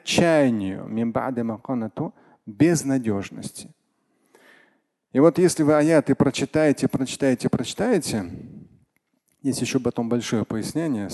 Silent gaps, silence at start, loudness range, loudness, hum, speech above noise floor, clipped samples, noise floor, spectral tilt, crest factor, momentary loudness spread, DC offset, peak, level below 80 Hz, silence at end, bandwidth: none; 0.05 s; 6 LU; -22 LUFS; none; 48 dB; under 0.1%; -70 dBFS; -5.5 dB/octave; 20 dB; 14 LU; under 0.1%; -4 dBFS; -54 dBFS; 0 s; 12.5 kHz